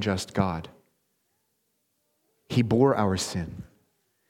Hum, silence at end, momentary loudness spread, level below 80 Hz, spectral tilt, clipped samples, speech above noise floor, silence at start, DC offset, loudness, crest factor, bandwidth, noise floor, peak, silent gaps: none; 0.65 s; 16 LU; -54 dBFS; -6 dB/octave; under 0.1%; 49 dB; 0 s; under 0.1%; -26 LUFS; 22 dB; 16.5 kHz; -75 dBFS; -8 dBFS; none